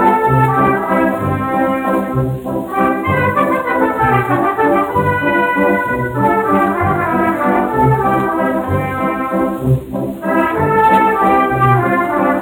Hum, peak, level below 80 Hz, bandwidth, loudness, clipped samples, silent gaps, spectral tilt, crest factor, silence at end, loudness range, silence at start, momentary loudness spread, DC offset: none; 0 dBFS; -40 dBFS; 18 kHz; -14 LUFS; under 0.1%; none; -8 dB/octave; 12 dB; 0 s; 2 LU; 0 s; 6 LU; under 0.1%